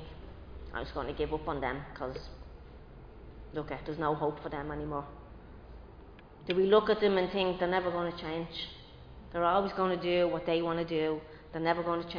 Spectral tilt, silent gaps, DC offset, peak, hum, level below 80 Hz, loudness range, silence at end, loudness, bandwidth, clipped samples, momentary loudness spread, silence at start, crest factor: -4 dB/octave; none; under 0.1%; -12 dBFS; none; -52 dBFS; 8 LU; 0 s; -32 LUFS; 5.2 kHz; under 0.1%; 23 LU; 0 s; 22 dB